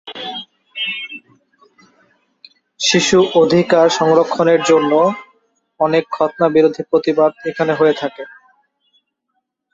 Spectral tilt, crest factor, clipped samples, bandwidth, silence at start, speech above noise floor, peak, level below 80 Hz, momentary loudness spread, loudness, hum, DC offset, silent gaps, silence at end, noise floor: -4.5 dB/octave; 16 dB; under 0.1%; 8 kHz; 0.05 s; 58 dB; -2 dBFS; -58 dBFS; 16 LU; -15 LUFS; none; under 0.1%; none; 1.45 s; -72 dBFS